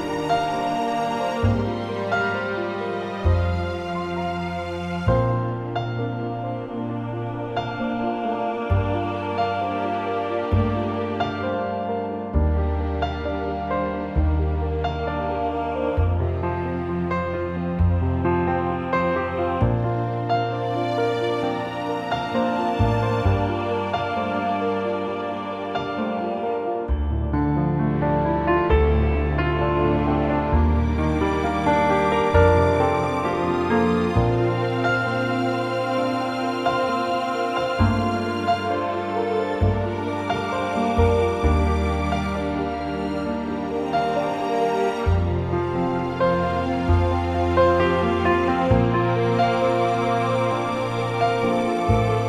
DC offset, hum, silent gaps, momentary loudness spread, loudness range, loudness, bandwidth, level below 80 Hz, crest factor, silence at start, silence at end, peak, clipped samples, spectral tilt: under 0.1%; none; none; 7 LU; 5 LU; -23 LUFS; 11 kHz; -32 dBFS; 18 dB; 0 s; 0 s; -4 dBFS; under 0.1%; -7.5 dB/octave